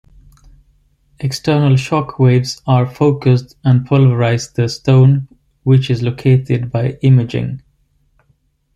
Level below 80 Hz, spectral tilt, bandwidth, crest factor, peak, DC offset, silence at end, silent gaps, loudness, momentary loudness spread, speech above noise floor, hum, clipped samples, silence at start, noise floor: -46 dBFS; -7.5 dB/octave; 8.6 kHz; 12 dB; -2 dBFS; under 0.1%; 1.2 s; none; -14 LUFS; 10 LU; 46 dB; none; under 0.1%; 1.2 s; -59 dBFS